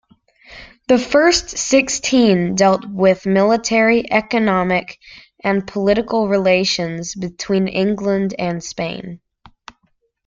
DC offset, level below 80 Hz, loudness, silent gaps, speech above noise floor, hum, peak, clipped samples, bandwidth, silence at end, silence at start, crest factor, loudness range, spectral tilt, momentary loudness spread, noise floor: under 0.1%; -48 dBFS; -16 LUFS; none; 48 dB; none; -2 dBFS; under 0.1%; 9.4 kHz; 1.1 s; 0.5 s; 16 dB; 5 LU; -4.5 dB/octave; 11 LU; -64 dBFS